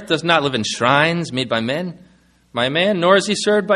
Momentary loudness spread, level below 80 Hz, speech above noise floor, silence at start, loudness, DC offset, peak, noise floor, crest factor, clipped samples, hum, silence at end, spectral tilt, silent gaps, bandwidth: 9 LU; -56 dBFS; 32 dB; 0 s; -17 LUFS; under 0.1%; 0 dBFS; -49 dBFS; 18 dB; under 0.1%; none; 0 s; -4 dB/octave; none; 11.5 kHz